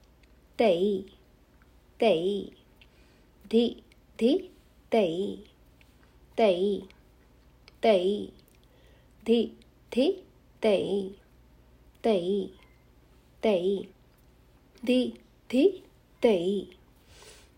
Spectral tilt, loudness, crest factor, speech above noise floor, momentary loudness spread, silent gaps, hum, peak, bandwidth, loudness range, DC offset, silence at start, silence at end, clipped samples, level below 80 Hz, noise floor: -6 dB/octave; -28 LUFS; 20 dB; 33 dB; 16 LU; none; 60 Hz at -60 dBFS; -10 dBFS; 16 kHz; 3 LU; under 0.1%; 0.6 s; 0.3 s; under 0.1%; -60 dBFS; -59 dBFS